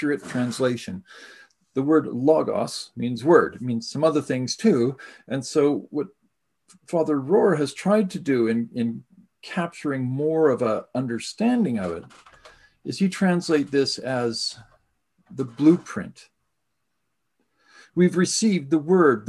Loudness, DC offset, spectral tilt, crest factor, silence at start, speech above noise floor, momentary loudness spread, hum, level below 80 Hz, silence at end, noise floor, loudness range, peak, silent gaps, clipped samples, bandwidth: -23 LUFS; under 0.1%; -5.5 dB/octave; 20 dB; 0 s; 56 dB; 12 LU; none; -64 dBFS; 0 s; -79 dBFS; 3 LU; -4 dBFS; none; under 0.1%; 12.5 kHz